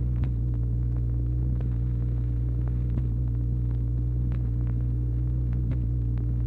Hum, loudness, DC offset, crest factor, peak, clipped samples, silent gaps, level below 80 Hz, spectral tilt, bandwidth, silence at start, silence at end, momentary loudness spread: none; -28 LUFS; under 0.1%; 12 dB; -14 dBFS; under 0.1%; none; -28 dBFS; -11.5 dB/octave; 2.5 kHz; 0 s; 0 s; 0 LU